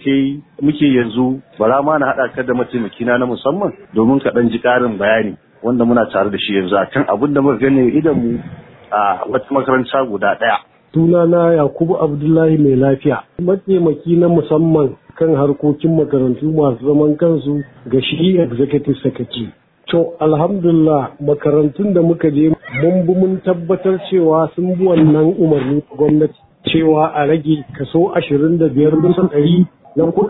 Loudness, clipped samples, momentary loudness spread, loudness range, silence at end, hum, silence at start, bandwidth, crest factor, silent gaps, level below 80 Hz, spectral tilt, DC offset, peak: -14 LUFS; under 0.1%; 7 LU; 2 LU; 0 s; none; 0.05 s; 4.1 kHz; 12 dB; none; -48 dBFS; -12 dB/octave; under 0.1%; -2 dBFS